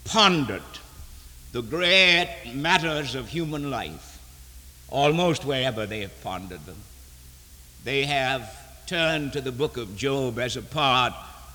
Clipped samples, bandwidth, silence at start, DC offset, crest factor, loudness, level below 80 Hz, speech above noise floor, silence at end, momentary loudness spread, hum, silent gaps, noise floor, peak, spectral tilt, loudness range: under 0.1%; over 20 kHz; 0 s; under 0.1%; 22 dB; -24 LUFS; -48 dBFS; 23 dB; 0 s; 22 LU; none; none; -48 dBFS; -4 dBFS; -4 dB/octave; 6 LU